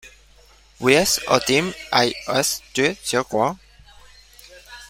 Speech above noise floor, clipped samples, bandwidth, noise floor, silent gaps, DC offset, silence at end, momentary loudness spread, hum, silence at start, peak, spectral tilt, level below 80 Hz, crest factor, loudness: 31 dB; under 0.1%; 16.5 kHz; -51 dBFS; none; under 0.1%; 0 s; 7 LU; none; 0.05 s; -2 dBFS; -3 dB/octave; -50 dBFS; 20 dB; -20 LUFS